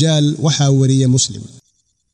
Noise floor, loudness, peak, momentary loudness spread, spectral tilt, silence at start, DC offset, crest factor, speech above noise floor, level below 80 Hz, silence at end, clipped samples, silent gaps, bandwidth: -63 dBFS; -14 LUFS; -4 dBFS; 6 LU; -5 dB/octave; 0 s; under 0.1%; 12 dB; 50 dB; -54 dBFS; 0.65 s; under 0.1%; none; 10.5 kHz